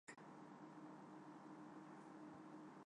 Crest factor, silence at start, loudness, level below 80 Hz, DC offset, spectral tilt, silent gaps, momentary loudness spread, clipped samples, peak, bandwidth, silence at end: 14 dB; 0.05 s; -59 LUFS; under -90 dBFS; under 0.1%; -6 dB/octave; none; 1 LU; under 0.1%; -44 dBFS; 10 kHz; 0.05 s